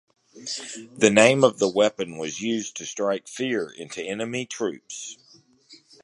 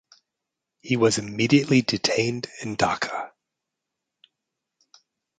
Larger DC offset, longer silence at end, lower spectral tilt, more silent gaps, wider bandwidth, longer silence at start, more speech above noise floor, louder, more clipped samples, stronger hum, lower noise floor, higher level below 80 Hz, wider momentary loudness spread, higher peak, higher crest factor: neither; second, 0.3 s vs 2.1 s; about the same, -3.5 dB/octave vs -4.5 dB/octave; neither; first, 11.5 kHz vs 9.4 kHz; second, 0.35 s vs 0.85 s; second, 32 dB vs 62 dB; about the same, -23 LUFS vs -23 LUFS; neither; neither; second, -56 dBFS vs -84 dBFS; second, -66 dBFS vs -60 dBFS; first, 19 LU vs 12 LU; first, 0 dBFS vs -4 dBFS; about the same, 24 dB vs 22 dB